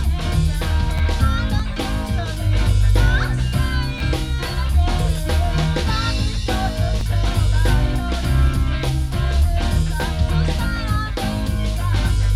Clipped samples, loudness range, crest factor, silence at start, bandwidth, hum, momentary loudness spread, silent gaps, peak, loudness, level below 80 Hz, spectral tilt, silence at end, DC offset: under 0.1%; 1 LU; 14 dB; 0 s; 15 kHz; none; 4 LU; none; -4 dBFS; -20 LUFS; -20 dBFS; -5.5 dB/octave; 0 s; under 0.1%